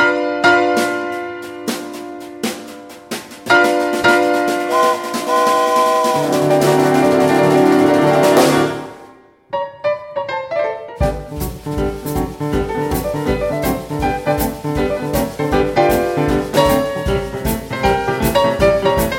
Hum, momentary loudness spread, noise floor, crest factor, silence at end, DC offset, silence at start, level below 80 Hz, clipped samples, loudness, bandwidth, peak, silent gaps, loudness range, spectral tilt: none; 13 LU; -43 dBFS; 16 dB; 0 s; under 0.1%; 0 s; -32 dBFS; under 0.1%; -16 LUFS; 17 kHz; 0 dBFS; none; 8 LU; -5 dB/octave